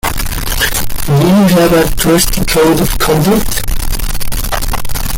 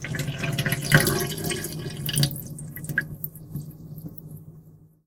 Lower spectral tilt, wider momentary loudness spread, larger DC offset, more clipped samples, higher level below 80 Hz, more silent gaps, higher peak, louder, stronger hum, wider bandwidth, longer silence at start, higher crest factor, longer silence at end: about the same, -4.5 dB/octave vs -4 dB/octave; second, 10 LU vs 20 LU; neither; neither; first, -18 dBFS vs -48 dBFS; neither; about the same, 0 dBFS vs 0 dBFS; first, -12 LUFS vs -26 LUFS; neither; second, 17 kHz vs 19 kHz; about the same, 0.05 s vs 0 s; second, 10 dB vs 28 dB; second, 0 s vs 0.2 s